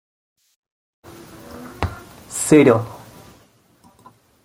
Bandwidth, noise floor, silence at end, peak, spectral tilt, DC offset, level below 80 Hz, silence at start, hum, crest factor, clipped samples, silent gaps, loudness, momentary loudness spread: 16 kHz; -54 dBFS; 1.5 s; -2 dBFS; -5.5 dB/octave; under 0.1%; -48 dBFS; 1.5 s; none; 20 dB; under 0.1%; none; -17 LUFS; 28 LU